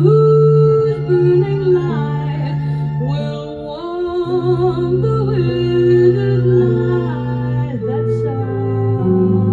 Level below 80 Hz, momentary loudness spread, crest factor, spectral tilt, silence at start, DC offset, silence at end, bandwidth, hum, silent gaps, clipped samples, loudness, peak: -40 dBFS; 9 LU; 14 dB; -10 dB/octave; 0 s; under 0.1%; 0 s; 7.2 kHz; none; none; under 0.1%; -15 LUFS; 0 dBFS